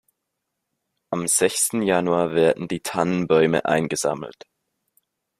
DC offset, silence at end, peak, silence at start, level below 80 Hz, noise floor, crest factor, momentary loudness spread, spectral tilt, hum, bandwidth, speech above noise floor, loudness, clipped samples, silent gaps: under 0.1%; 1.05 s; -4 dBFS; 1.1 s; -62 dBFS; -80 dBFS; 20 dB; 8 LU; -4 dB/octave; none; 15.5 kHz; 59 dB; -21 LUFS; under 0.1%; none